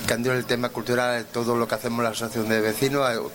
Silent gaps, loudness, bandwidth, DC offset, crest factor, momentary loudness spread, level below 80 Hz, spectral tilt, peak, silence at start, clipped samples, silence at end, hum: none; -24 LUFS; 17 kHz; under 0.1%; 18 dB; 3 LU; -56 dBFS; -4.5 dB/octave; -6 dBFS; 0 s; under 0.1%; 0 s; none